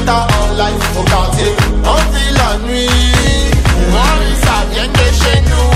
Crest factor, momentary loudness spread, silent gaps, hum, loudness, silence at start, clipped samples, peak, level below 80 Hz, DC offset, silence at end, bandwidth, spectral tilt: 10 dB; 4 LU; none; none; -12 LUFS; 0 s; under 0.1%; 0 dBFS; -14 dBFS; under 0.1%; 0 s; 15.5 kHz; -4.5 dB/octave